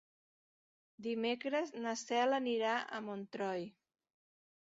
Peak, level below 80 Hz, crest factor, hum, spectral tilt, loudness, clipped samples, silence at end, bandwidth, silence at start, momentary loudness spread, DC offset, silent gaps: -22 dBFS; -88 dBFS; 16 dB; none; -2 dB/octave; -38 LUFS; under 0.1%; 1 s; 7.6 kHz; 1 s; 10 LU; under 0.1%; none